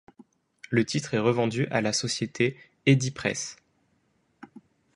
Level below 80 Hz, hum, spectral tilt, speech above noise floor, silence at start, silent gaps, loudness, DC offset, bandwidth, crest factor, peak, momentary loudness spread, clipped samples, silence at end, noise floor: -64 dBFS; none; -5 dB/octave; 44 dB; 0.7 s; none; -26 LUFS; under 0.1%; 11.5 kHz; 22 dB; -6 dBFS; 7 LU; under 0.1%; 0.35 s; -70 dBFS